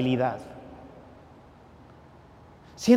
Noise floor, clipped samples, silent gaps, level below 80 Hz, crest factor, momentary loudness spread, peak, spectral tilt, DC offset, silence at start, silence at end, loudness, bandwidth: -51 dBFS; under 0.1%; none; -60 dBFS; 22 dB; 24 LU; -8 dBFS; -6 dB/octave; under 0.1%; 0 s; 0 s; -30 LUFS; 15.5 kHz